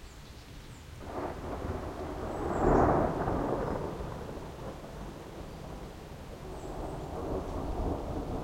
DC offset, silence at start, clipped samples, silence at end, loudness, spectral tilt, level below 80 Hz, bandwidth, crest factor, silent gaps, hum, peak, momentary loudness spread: under 0.1%; 0 s; under 0.1%; 0 s; -35 LUFS; -7.5 dB/octave; -42 dBFS; 16 kHz; 24 dB; none; none; -10 dBFS; 19 LU